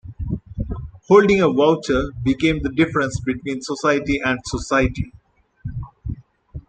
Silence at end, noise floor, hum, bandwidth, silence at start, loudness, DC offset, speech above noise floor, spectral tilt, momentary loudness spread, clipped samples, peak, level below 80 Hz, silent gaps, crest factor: 0.1 s; -41 dBFS; none; 9.2 kHz; 0.05 s; -19 LUFS; under 0.1%; 23 dB; -6 dB/octave; 18 LU; under 0.1%; -2 dBFS; -36 dBFS; none; 18 dB